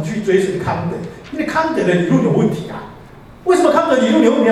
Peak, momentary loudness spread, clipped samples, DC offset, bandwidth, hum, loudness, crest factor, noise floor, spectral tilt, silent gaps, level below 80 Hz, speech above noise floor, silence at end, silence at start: 0 dBFS; 15 LU; under 0.1%; under 0.1%; 13 kHz; none; -15 LUFS; 14 dB; -38 dBFS; -6.5 dB/octave; none; -48 dBFS; 24 dB; 0 s; 0 s